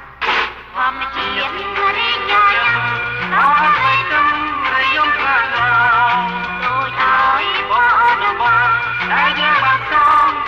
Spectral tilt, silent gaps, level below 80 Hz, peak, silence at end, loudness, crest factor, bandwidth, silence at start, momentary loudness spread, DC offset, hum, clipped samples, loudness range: -4 dB/octave; none; -44 dBFS; -2 dBFS; 0 s; -14 LUFS; 12 dB; 8.4 kHz; 0 s; 7 LU; under 0.1%; none; under 0.1%; 2 LU